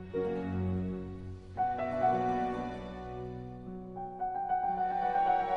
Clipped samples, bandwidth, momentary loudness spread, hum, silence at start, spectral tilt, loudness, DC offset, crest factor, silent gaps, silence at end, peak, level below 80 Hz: under 0.1%; 6.6 kHz; 14 LU; none; 0 s; -8.5 dB/octave; -34 LUFS; under 0.1%; 16 dB; none; 0 s; -18 dBFS; -54 dBFS